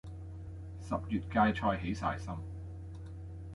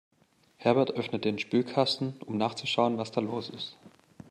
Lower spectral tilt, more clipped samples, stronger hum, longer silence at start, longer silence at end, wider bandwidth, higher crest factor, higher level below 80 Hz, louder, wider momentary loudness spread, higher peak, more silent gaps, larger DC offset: first, -7 dB/octave vs -5.5 dB/octave; neither; neither; second, 0.05 s vs 0.6 s; second, 0 s vs 0.4 s; about the same, 11.5 kHz vs 11.5 kHz; about the same, 20 dB vs 22 dB; first, -48 dBFS vs -74 dBFS; second, -35 LUFS vs -29 LUFS; first, 17 LU vs 9 LU; second, -16 dBFS vs -8 dBFS; neither; neither